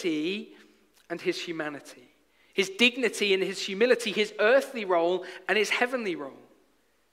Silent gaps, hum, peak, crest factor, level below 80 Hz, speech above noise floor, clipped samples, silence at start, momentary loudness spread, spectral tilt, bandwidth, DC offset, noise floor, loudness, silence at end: none; none; -6 dBFS; 22 dB; -78 dBFS; 41 dB; under 0.1%; 0 s; 13 LU; -3 dB/octave; 16 kHz; under 0.1%; -68 dBFS; -27 LUFS; 0.75 s